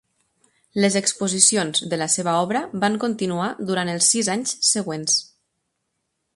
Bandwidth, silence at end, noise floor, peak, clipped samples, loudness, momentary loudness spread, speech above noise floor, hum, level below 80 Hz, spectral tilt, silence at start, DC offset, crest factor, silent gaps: 11.5 kHz; 1.1 s; -76 dBFS; 0 dBFS; under 0.1%; -20 LUFS; 9 LU; 54 dB; none; -66 dBFS; -2.5 dB/octave; 0.75 s; under 0.1%; 22 dB; none